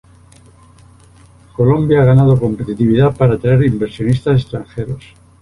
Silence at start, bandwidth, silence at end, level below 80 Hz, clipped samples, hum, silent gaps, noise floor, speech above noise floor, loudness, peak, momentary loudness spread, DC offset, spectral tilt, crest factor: 1.6 s; 11 kHz; 0.45 s; -38 dBFS; under 0.1%; none; none; -44 dBFS; 31 dB; -14 LUFS; -2 dBFS; 15 LU; under 0.1%; -9.5 dB/octave; 12 dB